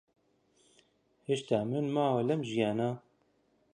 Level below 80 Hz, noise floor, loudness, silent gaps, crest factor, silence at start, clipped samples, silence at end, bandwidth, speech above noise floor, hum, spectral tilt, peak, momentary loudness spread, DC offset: -74 dBFS; -72 dBFS; -32 LUFS; none; 20 dB; 1.3 s; under 0.1%; 0.75 s; 10.5 kHz; 41 dB; none; -7 dB/octave; -14 dBFS; 7 LU; under 0.1%